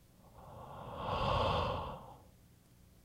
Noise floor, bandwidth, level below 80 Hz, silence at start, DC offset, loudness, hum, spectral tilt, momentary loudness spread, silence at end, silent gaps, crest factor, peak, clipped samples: -63 dBFS; 16 kHz; -50 dBFS; 0.25 s; under 0.1%; -37 LUFS; none; -6 dB/octave; 23 LU; 0.75 s; none; 20 dB; -20 dBFS; under 0.1%